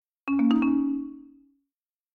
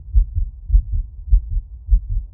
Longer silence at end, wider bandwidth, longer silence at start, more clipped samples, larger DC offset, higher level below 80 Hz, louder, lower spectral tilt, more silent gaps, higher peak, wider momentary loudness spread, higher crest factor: first, 0.9 s vs 0.05 s; first, 4.5 kHz vs 0.3 kHz; first, 0.25 s vs 0 s; neither; neither; second, -62 dBFS vs -18 dBFS; about the same, -25 LUFS vs -23 LUFS; second, -7.5 dB/octave vs -21 dB/octave; neither; second, -10 dBFS vs -2 dBFS; first, 11 LU vs 8 LU; about the same, 16 dB vs 16 dB